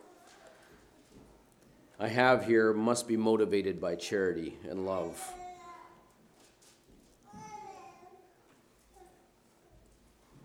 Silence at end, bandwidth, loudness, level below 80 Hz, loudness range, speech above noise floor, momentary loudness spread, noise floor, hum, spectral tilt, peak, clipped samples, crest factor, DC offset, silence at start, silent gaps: 2.35 s; 16 kHz; -30 LUFS; -68 dBFS; 20 LU; 35 dB; 24 LU; -65 dBFS; none; -5 dB/octave; -10 dBFS; under 0.1%; 24 dB; under 0.1%; 1.15 s; none